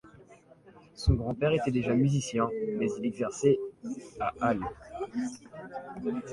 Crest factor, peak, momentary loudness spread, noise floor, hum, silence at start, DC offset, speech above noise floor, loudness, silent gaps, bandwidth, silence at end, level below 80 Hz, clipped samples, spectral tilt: 20 dB; -12 dBFS; 14 LU; -56 dBFS; none; 0.05 s; under 0.1%; 26 dB; -30 LUFS; none; 11.5 kHz; 0 s; -44 dBFS; under 0.1%; -6.5 dB/octave